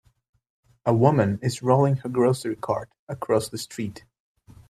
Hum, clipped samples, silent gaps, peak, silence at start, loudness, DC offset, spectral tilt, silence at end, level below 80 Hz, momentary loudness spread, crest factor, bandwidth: none; under 0.1%; 2.99-3.07 s; -4 dBFS; 0.85 s; -24 LUFS; under 0.1%; -7 dB/octave; 0.7 s; -60 dBFS; 13 LU; 22 dB; 14.5 kHz